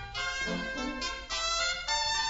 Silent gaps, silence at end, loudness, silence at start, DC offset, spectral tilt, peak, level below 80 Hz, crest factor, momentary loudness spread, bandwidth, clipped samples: none; 0 s; -31 LUFS; 0 s; under 0.1%; -1.5 dB/octave; -16 dBFS; -48 dBFS; 16 dB; 6 LU; 8 kHz; under 0.1%